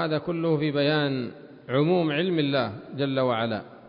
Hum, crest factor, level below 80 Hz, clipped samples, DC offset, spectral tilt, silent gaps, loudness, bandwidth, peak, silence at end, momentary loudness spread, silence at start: none; 14 dB; -64 dBFS; under 0.1%; under 0.1%; -11 dB/octave; none; -25 LUFS; 5.4 kHz; -12 dBFS; 0 s; 8 LU; 0 s